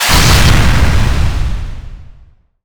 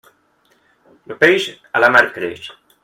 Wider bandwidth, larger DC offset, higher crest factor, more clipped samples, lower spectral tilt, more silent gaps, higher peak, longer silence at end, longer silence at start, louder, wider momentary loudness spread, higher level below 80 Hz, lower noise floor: first, over 20 kHz vs 16.5 kHz; neither; second, 12 dB vs 18 dB; neither; about the same, -4 dB/octave vs -4 dB/octave; neither; about the same, 0 dBFS vs 0 dBFS; second, 0 s vs 0.35 s; second, 0 s vs 1.1 s; first, -11 LUFS vs -15 LUFS; second, 18 LU vs 22 LU; first, -14 dBFS vs -60 dBFS; second, -43 dBFS vs -59 dBFS